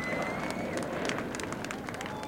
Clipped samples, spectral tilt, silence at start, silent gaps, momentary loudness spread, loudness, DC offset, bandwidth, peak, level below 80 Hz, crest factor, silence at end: under 0.1%; -4.5 dB/octave; 0 s; none; 4 LU; -34 LUFS; under 0.1%; 17 kHz; -14 dBFS; -58 dBFS; 20 dB; 0 s